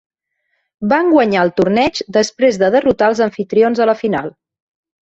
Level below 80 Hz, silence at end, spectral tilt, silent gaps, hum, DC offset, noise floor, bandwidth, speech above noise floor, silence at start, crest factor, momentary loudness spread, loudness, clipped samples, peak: -50 dBFS; 0.75 s; -5.5 dB/octave; none; none; under 0.1%; -69 dBFS; 8.2 kHz; 55 dB; 0.8 s; 14 dB; 6 LU; -14 LUFS; under 0.1%; -2 dBFS